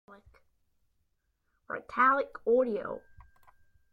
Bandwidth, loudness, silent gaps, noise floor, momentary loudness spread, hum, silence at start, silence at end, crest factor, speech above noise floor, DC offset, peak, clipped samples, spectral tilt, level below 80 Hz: 6 kHz; -28 LUFS; none; -77 dBFS; 16 LU; none; 0.1 s; 0.95 s; 20 dB; 48 dB; under 0.1%; -14 dBFS; under 0.1%; -7 dB/octave; -68 dBFS